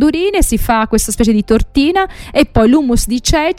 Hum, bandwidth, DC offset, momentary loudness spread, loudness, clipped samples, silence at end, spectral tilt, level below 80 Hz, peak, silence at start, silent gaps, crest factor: none; 16.5 kHz; under 0.1%; 4 LU; -13 LUFS; under 0.1%; 0.05 s; -4.5 dB/octave; -22 dBFS; 0 dBFS; 0 s; none; 12 dB